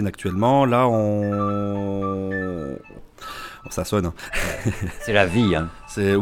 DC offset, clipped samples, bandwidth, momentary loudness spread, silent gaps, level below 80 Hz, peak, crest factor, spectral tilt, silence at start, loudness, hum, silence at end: under 0.1%; under 0.1%; 17.5 kHz; 16 LU; none; -40 dBFS; -2 dBFS; 20 dB; -6 dB/octave; 0 s; -22 LUFS; none; 0 s